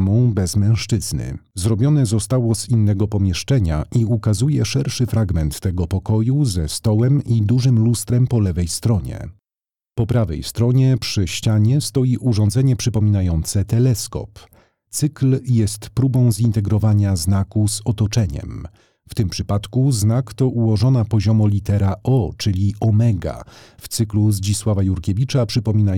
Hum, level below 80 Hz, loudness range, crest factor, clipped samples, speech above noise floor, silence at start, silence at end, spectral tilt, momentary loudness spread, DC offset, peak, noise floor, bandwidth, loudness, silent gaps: none; -36 dBFS; 2 LU; 10 dB; under 0.1%; over 73 dB; 0 s; 0 s; -6.5 dB/octave; 7 LU; 0.2%; -6 dBFS; under -90 dBFS; 15.5 kHz; -18 LUFS; none